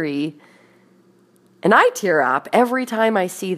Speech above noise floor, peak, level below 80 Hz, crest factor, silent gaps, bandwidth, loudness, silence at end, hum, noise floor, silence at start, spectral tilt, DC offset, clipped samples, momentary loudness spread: 37 dB; 0 dBFS; -74 dBFS; 20 dB; none; 15.5 kHz; -18 LUFS; 0 s; none; -55 dBFS; 0 s; -4.5 dB/octave; under 0.1%; under 0.1%; 10 LU